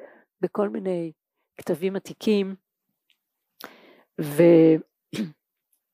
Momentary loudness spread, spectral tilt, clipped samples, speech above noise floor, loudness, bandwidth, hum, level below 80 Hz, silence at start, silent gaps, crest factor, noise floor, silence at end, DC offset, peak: 25 LU; -7.5 dB/octave; under 0.1%; 53 dB; -23 LUFS; 15.5 kHz; none; -80 dBFS; 0.4 s; none; 20 dB; -75 dBFS; 0.65 s; under 0.1%; -6 dBFS